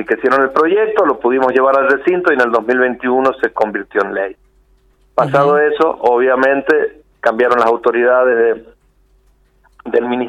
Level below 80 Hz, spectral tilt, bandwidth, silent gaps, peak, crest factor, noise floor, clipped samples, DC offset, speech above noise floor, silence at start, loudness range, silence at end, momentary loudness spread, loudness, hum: -54 dBFS; -6.5 dB/octave; 9.6 kHz; none; 0 dBFS; 14 dB; -54 dBFS; under 0.1%; under 0.1%; 40 dB; 0 s; 3 LU; 0 s; 7 LU; -14 LUFS; none